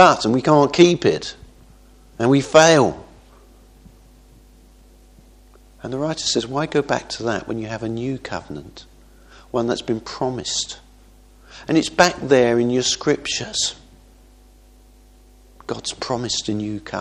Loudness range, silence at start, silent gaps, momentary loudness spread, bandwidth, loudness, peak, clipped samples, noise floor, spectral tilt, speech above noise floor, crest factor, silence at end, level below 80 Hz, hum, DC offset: 10 LU; 0 s; none; 16 LU; 12.5 kHz; -19 LUFS; 0 dBFS; under 0.1%; -49 dBFS; -4 dB/octave; 30 dB; 20 dB; 0 s; -48 dBFS; none; under 0.1%